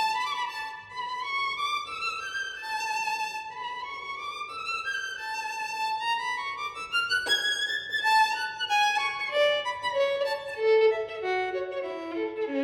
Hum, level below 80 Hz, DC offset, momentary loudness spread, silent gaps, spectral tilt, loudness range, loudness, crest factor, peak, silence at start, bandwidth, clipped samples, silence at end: none; -70 dBFS; under 0.1%; 11 LU; none; -1 dB/octave; 7 LU; -28 LUFS; 16 dB; -12 dBFS; 0 s; 16 kHz; under 0.1%; 0 s